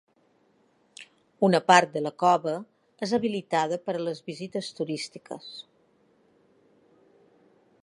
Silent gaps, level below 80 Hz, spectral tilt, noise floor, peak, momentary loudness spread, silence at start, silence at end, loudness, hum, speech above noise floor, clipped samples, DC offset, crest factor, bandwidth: none; -78 dBFS; -4.5 dB/octave; -66 dBFS; -2 dBFS; 22 LU; 1 s; 2.2 s; -26 LUFS; none; 40 dB; under 0.1%; under 0.1%; 26 dB; 11.5 kHz